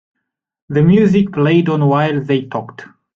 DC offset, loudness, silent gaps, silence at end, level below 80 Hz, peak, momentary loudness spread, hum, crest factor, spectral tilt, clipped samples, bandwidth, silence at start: under 0.1%; -14 LUFS; none; 0.3 s; -50 dBFS; -2 dBFS; 13 LU; none; 14 dB; -9 dB/octave; under 0.1%; 7.2 kHz; 0.7 s